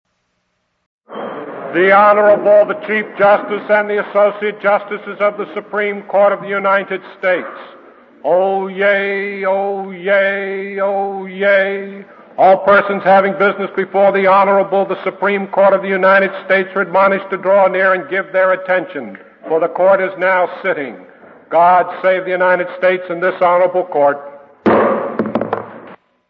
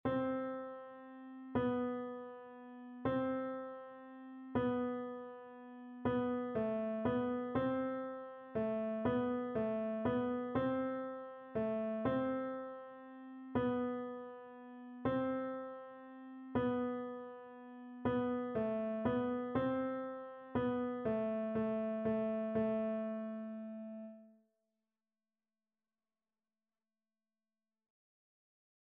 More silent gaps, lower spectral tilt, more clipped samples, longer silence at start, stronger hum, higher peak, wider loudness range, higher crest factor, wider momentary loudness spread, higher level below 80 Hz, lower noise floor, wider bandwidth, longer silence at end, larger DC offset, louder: neither; first, -8.5 dB/octave vs -6.5 dB/octave; neither; first, 1.1 s vs 0.05 s; neither; first, 0 dBFS vs -24 dBFS; about the same, 4 LU vs 3 LU; about the same, 14 dB vs 16 dB; second, 12 LU vs 16 LU; about the same, -64 dBFS vs -68 dBFS; second, -67 dBFS vs under -90 dBFS; first, 5.2 kHz vs 4 kHz; second, 0.35 s vs 4.65 s; neither; first, -14 LUFS vs -39 LUFS